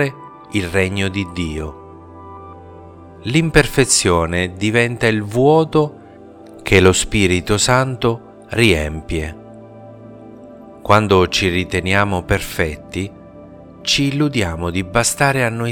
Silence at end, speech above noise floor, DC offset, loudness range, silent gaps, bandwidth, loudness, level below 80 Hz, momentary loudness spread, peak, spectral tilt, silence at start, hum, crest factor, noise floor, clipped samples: 0 s; 23 dB; under 0.1%; 5 LU; none; 19 kHz; -16 LUFS; -36 dBFS; 16 LU; 0 dBFS; -4.5 dB/octave; 0 s; none; 18 dB; -39 dBFS; under 0.1%